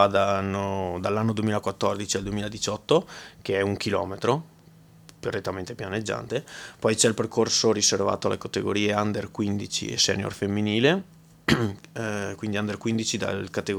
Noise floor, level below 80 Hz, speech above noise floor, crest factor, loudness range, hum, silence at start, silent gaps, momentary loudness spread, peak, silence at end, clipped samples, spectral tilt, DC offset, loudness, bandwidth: -52 dBFS; -56 dBFS; 27 dB; 22 dB; 5 LU; none; 0 s; none; 10 LU; -4 dBFS; 0 s; under 0.1%; -4 dB/octave; under 0.1%; -26 LUFS; 19 kHz